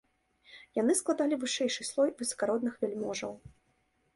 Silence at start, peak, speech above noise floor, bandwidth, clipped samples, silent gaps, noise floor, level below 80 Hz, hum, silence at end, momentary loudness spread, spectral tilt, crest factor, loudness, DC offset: 0.5 s; -16 dBFS; 42 dB; 12 kHz; under 0.1%; none; -73 dBFS; -70 dBFS; none; 0.7 s; 9 LU; -3 dB/octave; 18 dB; -31 LUFS; under 0.1%